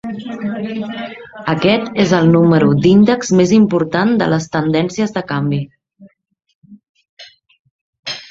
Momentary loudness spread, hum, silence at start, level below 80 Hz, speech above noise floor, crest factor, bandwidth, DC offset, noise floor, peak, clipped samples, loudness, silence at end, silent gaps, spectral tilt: 15 LU; none; 0.05 s; -50 dBFS; 32 dB; 14 dB; 7.8 kHz; under 0.1%; -46 dBFS; 0 dBFS; under 0.1%; -14 LUFS; 0.05 s; 6.55-6.62 s, 6.89-6.95 s, 7.09-7.17 s, 7.59-7.65 s, 7.71-7.93 s, 7.99-8.03 s; -6.5 dB/octave